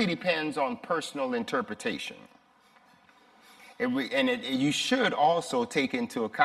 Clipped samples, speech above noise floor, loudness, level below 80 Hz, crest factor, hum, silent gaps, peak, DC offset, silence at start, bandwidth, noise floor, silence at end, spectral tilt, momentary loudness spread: under 0.1%; 33 dB; -29 LUFS; -72 dBFS; 22 dB; none; none; -8 dBFS; under 0.1%; 0 s; 14.5 kHz; -61 dBFS; 0 s; -4 dB/octave; 8 LU